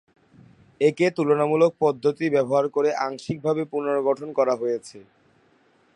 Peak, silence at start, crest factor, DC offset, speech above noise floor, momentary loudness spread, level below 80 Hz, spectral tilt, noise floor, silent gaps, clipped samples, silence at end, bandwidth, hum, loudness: -6 dBFS; 0.8 s; 18 dB; under 0.1%; 39 dB; 7 LU; -68 dBFS; -6.5 dB/octave; -61 dBFS; none; under 0.1%; 0.95 s; 11 kHz; none; -23 LUFS